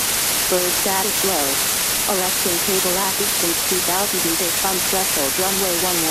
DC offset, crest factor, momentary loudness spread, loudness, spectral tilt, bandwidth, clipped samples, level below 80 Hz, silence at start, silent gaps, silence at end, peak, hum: under 0.1%; 14 dB; 1 LU; -17 LUFS; -1 dB/octave; 16 kHz; under 0.1%; -46 dBFS; 0 s; none; 0 s; -6 dBFS; none